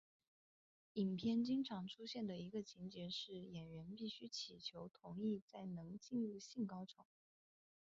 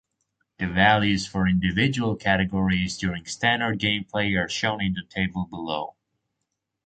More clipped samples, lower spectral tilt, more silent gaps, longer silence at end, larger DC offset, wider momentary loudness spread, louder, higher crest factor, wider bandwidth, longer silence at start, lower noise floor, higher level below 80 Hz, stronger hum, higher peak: neither; about the same, -6 dB/octave vs -5 dB/octave; first, 5.42-5.48 s vs none; about the same, 0.9 s vs 0.95 s; neither; about the same, 12 LU vs 10 LU; second, -47 LUFS vs -24 LUFS; about the same, 16 dB vs 20 dB; second, 7.6 kHz vs 9.2 kHz; first, 0.95 s vs 0.6 s; first, under -90 dBFS vs -81 dBFS; second, -80 dBFS vs -46 dBFS; neither; second, -30 dBFS vs -4 dBFS